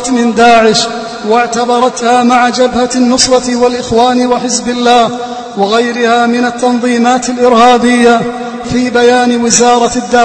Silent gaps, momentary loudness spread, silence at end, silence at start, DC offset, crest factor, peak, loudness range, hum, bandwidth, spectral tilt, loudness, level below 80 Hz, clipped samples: none; 7 LU; 0 s; 0 s; under 0.1%; 8 dB; 0 dBFS; 2 LU; none; 11 kHz; -3 dB/octave; -9 LUFS; -40 dBFS; 0.9%